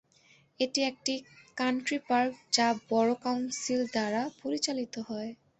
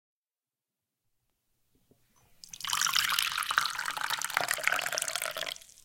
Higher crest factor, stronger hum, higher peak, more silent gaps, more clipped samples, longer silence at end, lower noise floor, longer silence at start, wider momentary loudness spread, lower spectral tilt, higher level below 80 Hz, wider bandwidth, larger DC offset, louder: second, 20 dB vs 28 dB; neither; second, -12 dBFS vs -6 dBFS; neither; neither; about the same, 0.25 s vs 0.25 s; second, -63 dBFS vs under -90 dBFS; second, 0.6 s vs 2.45 s; about the same, 10 LU vs 10 LU; first, -2.5 dB/octave vs 1.5 dB/octave; about the same, -74 dBFS vs -72 dBFS; second, 8.4 kHz vs 17 kHz; neither; about the same, -31 LUFS vs -30 LUFS